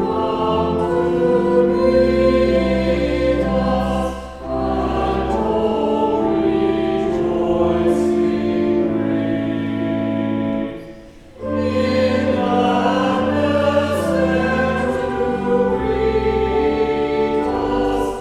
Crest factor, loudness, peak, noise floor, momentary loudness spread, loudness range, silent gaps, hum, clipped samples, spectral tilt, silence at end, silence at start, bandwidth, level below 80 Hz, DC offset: 14 dB; -18 LUFS; -4 dBFS; -39 dBFS; 6 LU; 4 LU; none; none; under 0.1%; -7 dB/octave; 0 s; 0 s; 12.5 kHz; -34 dBFS; under 0.1%